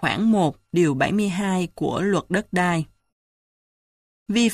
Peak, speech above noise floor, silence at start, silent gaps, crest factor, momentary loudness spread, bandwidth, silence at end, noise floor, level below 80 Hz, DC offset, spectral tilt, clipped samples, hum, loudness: -6 dBFS; over 69 dB; 0 s; 3.12-4.26 s; 16 dB; 6 LU; 13.5 kHz; 0 s; under -90 dBFS; -54 dBFS; under 0.1%; -5.5 dB/octave; under 0.1%; none; -22 LUFS